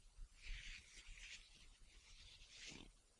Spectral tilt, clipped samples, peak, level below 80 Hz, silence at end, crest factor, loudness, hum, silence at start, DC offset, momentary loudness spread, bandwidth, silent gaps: -1.5 dB/octave; under 0.1%; -40 dBFS; -60 dBFS; 0 s; 18 dB; -59 LUFS; none; 0 s; under 0.1%; 11 LU; 11 kHz; none